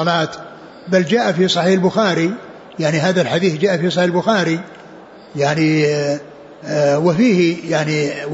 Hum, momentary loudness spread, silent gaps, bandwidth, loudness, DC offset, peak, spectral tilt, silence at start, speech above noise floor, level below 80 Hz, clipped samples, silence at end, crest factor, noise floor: none; 14 LU; none; 8 kHz; -16 LUFS; under 0.1%; -4 dBFS; -5.5 dB/octave; 0 s; 23 dB; -60 dBFS; under 0.1%; 0 s; 14 dB; -39 dBFS